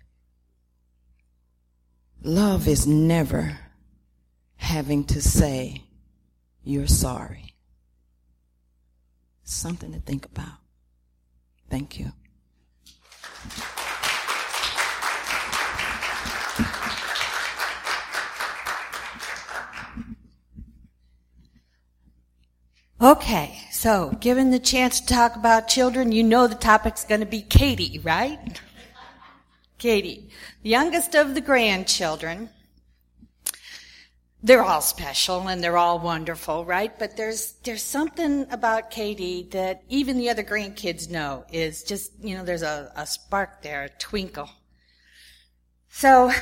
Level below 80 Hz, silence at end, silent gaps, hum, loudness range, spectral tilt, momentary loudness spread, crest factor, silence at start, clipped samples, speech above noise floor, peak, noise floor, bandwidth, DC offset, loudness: -38 dBFS; 0 s; none; 60 Hz at -50 dBFS; 16 LU; -4 dB/octave; 18 LU; 24 dB; 2.2 s; under 0.1%; 44 dB; 0 dBFS; -66 dBFS; 16.5 kHz; under 0.1%; -23 LUFS